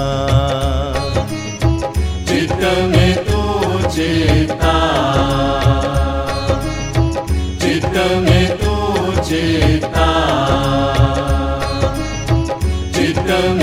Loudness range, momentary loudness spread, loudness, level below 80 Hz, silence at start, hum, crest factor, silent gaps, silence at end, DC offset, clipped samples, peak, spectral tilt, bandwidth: 2 LU; 6 LU; -16 LUFS; -22 dBFS; 0 s; none; 14 dB; none; 0 s; under 0.1%; under 0.1%; 0 dBFS; -6 dB/octave; 15 kHz